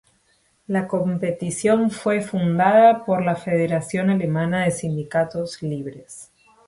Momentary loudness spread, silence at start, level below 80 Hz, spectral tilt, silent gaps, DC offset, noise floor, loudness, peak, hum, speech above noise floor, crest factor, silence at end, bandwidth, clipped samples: 13 LU; 0.7 s; -58 dBFS; -6.5 dB/octave; none; under 0.1%; -63 dBFS; -21 LUFS; -4 dBFS; none; 43 dB; 18 dB; 0.45 s; 11.5 kHz; under 0.1%